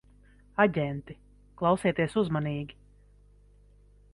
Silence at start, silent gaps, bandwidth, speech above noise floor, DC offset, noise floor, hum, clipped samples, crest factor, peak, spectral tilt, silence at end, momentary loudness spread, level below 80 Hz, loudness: 0.6 s; none; 11.5 kHz; 30 dB; under 0.1%; -58 dBFS; 50 Hz at -50 dBFS; under 0.1%; 22 dB; -8 dBFS; -7 dB/octave; 1.45 s; 17 LU; -56 dBFS; -28 LUFS